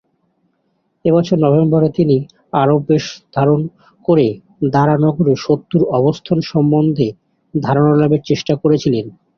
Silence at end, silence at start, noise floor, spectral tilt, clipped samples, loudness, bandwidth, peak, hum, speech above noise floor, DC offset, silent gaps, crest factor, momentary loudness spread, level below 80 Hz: 0.25 s; 1.05 s; -65 dBFS; -8 dB/octave; under 0.1%; -15 LUFS; 6.8 kHz; -2 dBFS; none; 51 dB; under 0.1%; none; 14 dB; 8 LU; -50 dBFS